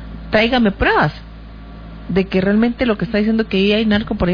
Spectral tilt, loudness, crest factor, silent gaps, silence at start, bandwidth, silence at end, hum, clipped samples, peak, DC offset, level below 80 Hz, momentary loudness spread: -8 dB/octave; -16 LUFS; 16 dB; none; 0 s; 5.2 kHz; 0 s; none; under 0.1%; 0 dBFS; under 0.1%; -32 dBFS; 20 LU